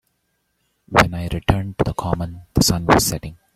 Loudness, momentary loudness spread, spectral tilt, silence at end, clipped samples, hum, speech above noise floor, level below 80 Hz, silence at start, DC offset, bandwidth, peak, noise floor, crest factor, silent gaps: -19 LUFS; 9 LU; -4.5 dB/octave; 0.2 s; under 0.1%; none; 52 dB; -34 dBFS; 0.9 s; under 0.1%; 16.5 kHz; 0 dBFS; -70 dBFS; 20 dB; none